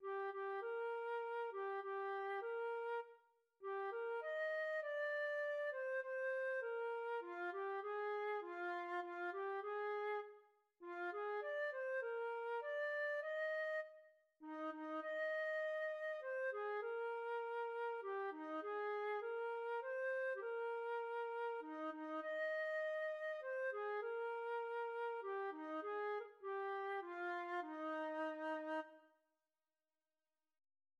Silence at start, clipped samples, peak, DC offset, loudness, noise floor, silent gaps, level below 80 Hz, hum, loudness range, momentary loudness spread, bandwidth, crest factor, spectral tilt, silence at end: 0 s; under 0.1%; -34 dBFS; under 0.1%; -45 LUFS; under -90 dBFS; none; under -90 dBFS; none; 2 LU; 5 LU; 11 kHz; 10 dB; -2.5 dB/octave; 1.95 s